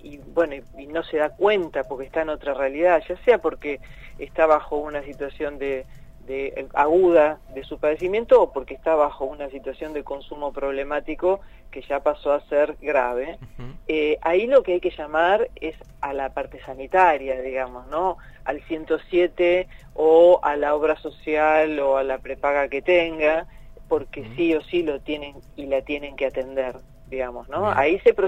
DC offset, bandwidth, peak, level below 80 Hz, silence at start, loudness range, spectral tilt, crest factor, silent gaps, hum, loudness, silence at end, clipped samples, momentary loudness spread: under 0.1%; 8 kHz; -4 dBFS; -46 dBFS; 0.05 s; 6 LU; -6.5 dB/octave; 18 dB; none; none; -22 LUFS; 0 s; under 0.1%; 15 LU